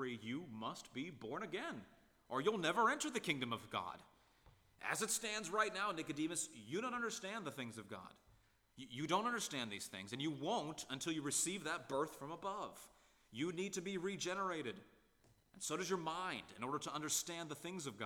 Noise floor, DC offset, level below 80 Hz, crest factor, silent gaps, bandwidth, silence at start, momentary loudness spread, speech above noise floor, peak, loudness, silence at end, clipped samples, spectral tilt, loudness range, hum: -73 dBFS; under 0.1%; -78 dBFS; 22 dB; none; 19.5 kHz; 0 s; 11 LU; 30 dB; -22 dBFS; -42 LUFS; 0 s; under 0.1%; -3 dB/octave; 4 LU; none